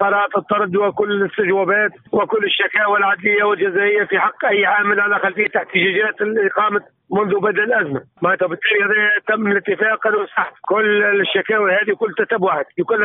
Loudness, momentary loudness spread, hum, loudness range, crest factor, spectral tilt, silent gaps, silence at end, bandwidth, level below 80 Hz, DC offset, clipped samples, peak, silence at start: -17 LUFS; 5 LU; none; 2 LU; 14 dB; -2 dB/octave; none; 0 s; 3.9 kHz; -66 dBFS; under 0.1%; under 0.1%; -2 dBFS; 0 s